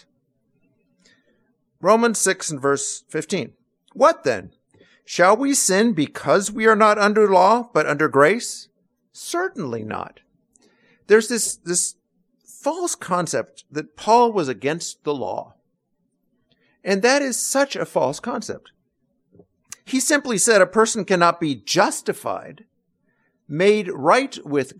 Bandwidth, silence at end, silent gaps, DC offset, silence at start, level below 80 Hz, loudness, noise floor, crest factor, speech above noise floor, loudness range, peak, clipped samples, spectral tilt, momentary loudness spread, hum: 15 kHz; 0.1 s; none; under 0.1%; 1.85 s; -66 dBFS; -19 LUFS; -71 dBFS; 18 dB; 52 dB; 6 LU; -2 dBFS; under 0.1%; -3.5 dB/octave; 14 LU; none